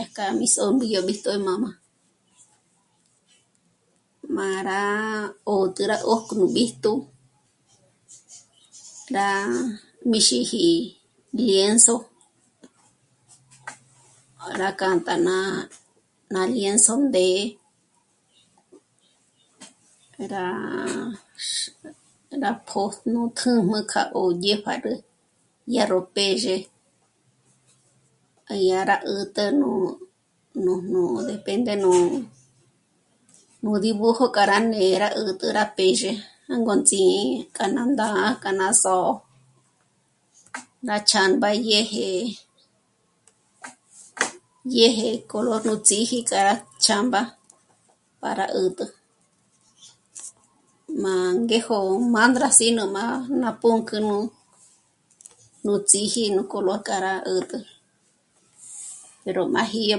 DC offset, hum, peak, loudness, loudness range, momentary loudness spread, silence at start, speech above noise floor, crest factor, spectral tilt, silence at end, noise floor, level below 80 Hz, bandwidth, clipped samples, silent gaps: under 0.1%; none; 0 dBFS; -22 LUFS; 9 LU; 16 LU; 0 s; 45 dB; 24 dB; -2.5 dB/octave; 0 s; -67 dBFS; -68 dBFS; 11.5 kHz; under 0.1%; none